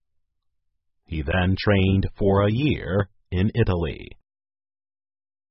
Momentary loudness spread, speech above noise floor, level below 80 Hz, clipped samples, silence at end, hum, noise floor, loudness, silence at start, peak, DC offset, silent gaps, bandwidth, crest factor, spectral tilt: 11 LU; 51 dB; -36 dBFS; under 0.1%; 1.35 s; none; -73 dBFS; -23 LUFS; 1.1 s; -6 dBFS; under 0.1%; none; 5.8 kHz; 18 dB; -11 dB/octave